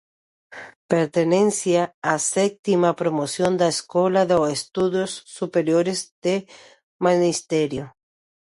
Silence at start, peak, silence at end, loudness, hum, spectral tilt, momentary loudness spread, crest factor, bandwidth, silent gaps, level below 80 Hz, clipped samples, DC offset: 0.5 s; -4 dBFS; 0.65 s; -21 LUFS; none; -4.5 dB/octave; 8 LU; 18 dB; 11.5 kHz; 0.76-0.89 s, 1.94-2.02 s, 2.59-2.63 s, 6.11-6.22 s, 6.83-6.99 s; -60 dBFS; under 0.1%; under 0.1%